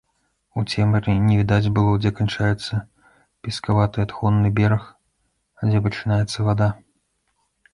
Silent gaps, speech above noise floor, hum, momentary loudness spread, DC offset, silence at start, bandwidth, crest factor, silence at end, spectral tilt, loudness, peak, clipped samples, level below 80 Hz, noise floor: none; 51 dB; none; 10 LU; under 0.1%; 0.55 s; 11 kHz; 16 dB; 1 s; -7 dB/octave; -21 LUFS; -4 dBFS; under 0.1%; -42 dBFS; -70 dBFS